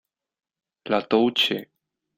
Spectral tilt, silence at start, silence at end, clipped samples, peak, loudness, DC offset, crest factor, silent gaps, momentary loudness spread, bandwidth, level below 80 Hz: -4.5 dB/octave; 0.85 s; 0.55 s; under 0.1%; -6 dBFS; -22 LUFS; under 0.1%; 20 dB; none; 12 LU; 16 kHz; -68 dBFS